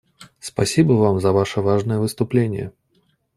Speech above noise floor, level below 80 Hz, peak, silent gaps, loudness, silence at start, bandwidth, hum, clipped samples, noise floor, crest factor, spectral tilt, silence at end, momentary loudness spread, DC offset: 46 dB; -52 dBFS; -2 dBFS; none; -19 LUFS; 0.2 s; 14.5 kHz; none; under 0.1%; -64 dBFS; 18 dB; -6.5 dB/octave; 0.7 s; 14 LU; under 0.1%